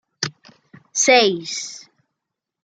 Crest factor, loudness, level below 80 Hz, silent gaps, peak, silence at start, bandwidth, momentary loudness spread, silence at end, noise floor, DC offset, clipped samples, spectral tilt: 20 dB; -18 LUFS; -72 dBFS; none; -2 dBFS; 0.2 s; 10.5 kHz; 17 LU; 0.85 s; -82 dBFS; under 0.1%; under 0.1%; -1.5 dB/octave